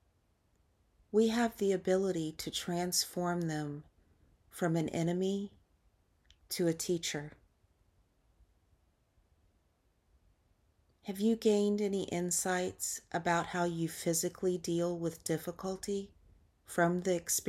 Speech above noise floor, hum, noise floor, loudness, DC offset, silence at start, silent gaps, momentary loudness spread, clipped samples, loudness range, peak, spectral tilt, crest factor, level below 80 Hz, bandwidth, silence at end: 41 dB; none; -74 dBFS; -34 LUFS; under 0.1%; 1.15 s; none; 9 LU; under 0.1%; 7 LU; -18 dBFS; -4.5 dB/octave; 18 dB; -68 dBFS; 16 kHz; 0 s